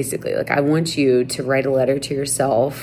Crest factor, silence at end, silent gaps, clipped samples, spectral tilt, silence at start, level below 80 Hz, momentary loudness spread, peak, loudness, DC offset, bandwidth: 16 dB; 0 s; none; under 0.1%; -5 dB/octave; 0 s; -52 dBFS; 4 LU; -2 dBFS; -19 LUFS; under 0.1%; 19.5 kHz